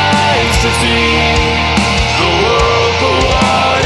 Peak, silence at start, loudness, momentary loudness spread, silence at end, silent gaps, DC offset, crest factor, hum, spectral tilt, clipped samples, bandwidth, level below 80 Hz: 0 dBFS; 0 s; -10 LUFS; 1 LU; 0 s; none; under 0.1%; 10 dB; none; -4 dB/octave; under 0.1%; 13.5 kHz; -22 dBFS